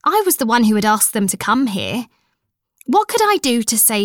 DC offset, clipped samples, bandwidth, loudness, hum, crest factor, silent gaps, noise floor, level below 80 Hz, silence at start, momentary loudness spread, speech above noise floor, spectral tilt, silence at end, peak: under 0.1%; under 0.1%; 19.5 kHz; -15 LUFS; none; 14 dB; none; -72 dBFS; -58 dBFS; 0.05 s; 9 LU; 56 dB; -3 dB/octave; 0 s; -2 dBFS